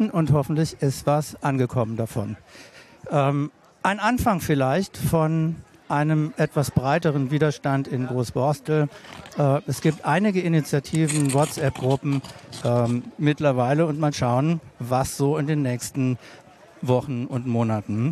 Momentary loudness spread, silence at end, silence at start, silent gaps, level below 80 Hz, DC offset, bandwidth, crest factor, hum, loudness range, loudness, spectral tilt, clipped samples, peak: 7 LU; 0 s; 0 s; none; -50 dBFS; under 0.1%; 14 kHz; 16 dB; none; 2 LU; -23 LUFS; -6.5 dB/octave; under 0.1%; -6 dBFS